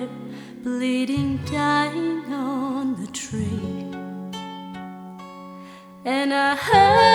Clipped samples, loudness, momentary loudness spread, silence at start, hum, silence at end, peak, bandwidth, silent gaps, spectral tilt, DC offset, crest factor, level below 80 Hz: under 0.1%; -23 LUFS; 20 LU; 0 s; none; 0 s; -2 dBFS; 17 kHz; none; -5 dB/octave; under 0.1%; 20 dB; -52 dBFS